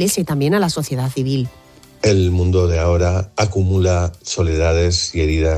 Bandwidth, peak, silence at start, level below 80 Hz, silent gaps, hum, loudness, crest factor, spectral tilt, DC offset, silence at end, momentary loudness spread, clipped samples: 14.5 kHz; -2 dBFS; 0 s; -24 dBFS; none; none; -17 LUFS; 16 dB; -5.5 dB/octave; under 0.1%; 0 s; 5 LU; under 0.1%